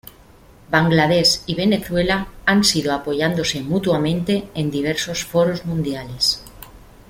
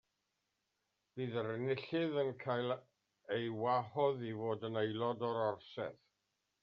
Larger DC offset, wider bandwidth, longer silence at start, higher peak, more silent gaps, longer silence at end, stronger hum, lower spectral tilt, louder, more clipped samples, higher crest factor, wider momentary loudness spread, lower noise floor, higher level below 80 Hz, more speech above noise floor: neither; first, 16.5 kHz vs 6.2 kHz; second, 0.05 s vs 1.15 s; first, -2 dBFS vs -22 dBFS; neither; second, 0.3 s vs 0.7 s; neither; about the same, -4.5 dB/octave vs -5 dB/octave; first, -19 LUFS vs -39 LUFS; neither; about the same, 18 dB vs 18 dB; about the same, 8 LU vs 9 LU; second, -47 dBFS vs -86 dBFS; first, -44 dBFS vs -84 dBFS; second, 28 dB vs 48 dB